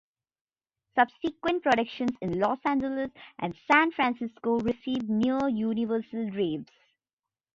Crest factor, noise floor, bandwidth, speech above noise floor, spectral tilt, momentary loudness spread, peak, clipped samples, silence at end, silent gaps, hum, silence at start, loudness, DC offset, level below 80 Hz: 22 dB; under -90 dBFS; 7.6 kHz; over 62 dB; -6.5 dB/octave; 10 LU; -8 dBFS; under 0.1%; 0.9 s; none; none; 0.95 s; -28 LUFS; under 0.1%; -62 dBFS